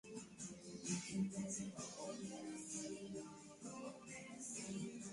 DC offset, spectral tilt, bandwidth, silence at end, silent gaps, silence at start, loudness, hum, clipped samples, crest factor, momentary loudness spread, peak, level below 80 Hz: under 0.1%; -4 dB/octave; 11.5 kHz; 0 s; none; 0.05 s; -48 LUFS; none; under 0.1%; 20 dB; 10 LU; -30 dBFS; -78 dBFS